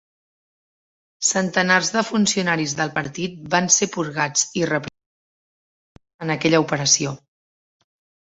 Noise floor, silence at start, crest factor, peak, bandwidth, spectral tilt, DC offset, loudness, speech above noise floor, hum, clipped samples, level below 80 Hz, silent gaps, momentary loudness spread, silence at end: under -90 dBFS; 1.2 s; 22 dB; -2 dBFS; 8.4 kHz; -3 dB/octave; under 0.1%; -20 LUFS; over 70 dB; none; under 0.1%; -62 dBFS; 5.06-5.95 s, 6.14-6.19 s; 11 LU; 1.15 s